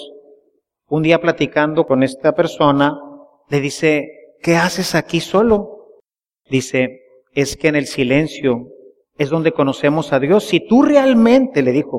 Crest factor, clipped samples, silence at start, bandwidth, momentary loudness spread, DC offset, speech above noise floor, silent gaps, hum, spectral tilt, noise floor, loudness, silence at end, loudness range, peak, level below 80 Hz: 16 dB; under 0.1%; 0 s; 15.5 kHz; 10 LU; under 0.1%; 48 dB; none; none; -5.5 dB/octave; -62 dBFS; -16 LUFS; 0 s; 4 LU; 0 dBFS; -48 dBFS